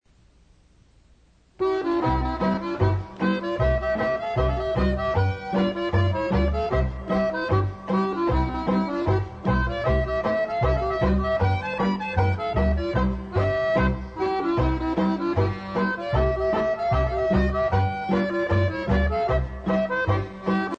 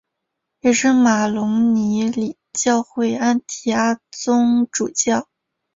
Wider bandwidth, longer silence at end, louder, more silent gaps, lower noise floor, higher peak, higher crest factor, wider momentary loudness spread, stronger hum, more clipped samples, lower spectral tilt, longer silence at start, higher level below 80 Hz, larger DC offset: about the same, 7.4 kHz vs 7.8 kHz; second, 0 s vs 0.55 s; second, -24 LUFS vs -18 LUFS; neither; second, -57 dBFS vs -78 dBFS; second, -10 dBFS vs -4 dBFS; about the same, 14 dB vs 14 dB; second, 3 LU vs 7 LU; neither; neither; first, -8.5 dB/octave vs -4 dB/octave; first, 1.6 s vs 0.65 s; first, -32 dBFS vs -60 dBFS; neither